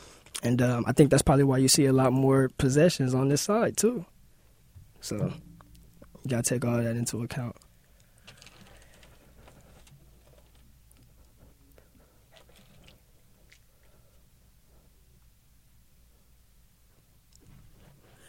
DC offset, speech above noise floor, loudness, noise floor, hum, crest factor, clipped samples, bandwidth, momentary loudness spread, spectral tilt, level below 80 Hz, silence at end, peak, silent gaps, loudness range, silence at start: under 0.1%; 36 dB; -25 LUFS; -61 dBFS; none; 24 dB; under 0.1%; 16.5 kHz; 17 LU; -5 dB/octave; -52 dBFS; 10.75 s; -6 dBFS; none; 13 LU; 0.35 s